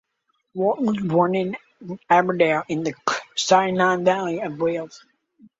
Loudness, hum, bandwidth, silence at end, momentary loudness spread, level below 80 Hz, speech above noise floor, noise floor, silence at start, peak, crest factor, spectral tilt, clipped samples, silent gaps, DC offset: -21 LUFS; none; 8 kHz; 0.65 s; 14 LU; -66 dBFS; 51 dB; -72 dBFS; 0.55 s; -2 dBFS; 20 dB; -5 dB/octave; under 0.1%; none; under 0.1%